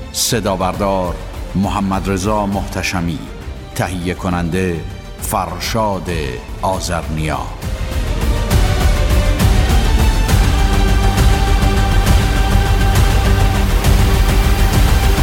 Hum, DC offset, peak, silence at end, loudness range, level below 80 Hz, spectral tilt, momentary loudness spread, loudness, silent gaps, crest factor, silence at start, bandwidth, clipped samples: none; under 0.1%; -2 dBFS; 0 s; 6 LU; -16 dBFS; -5 dB/octave; 8 LU; -16 LUFS; none; 12 dB; 0 s; 17 kHz; under 0.1%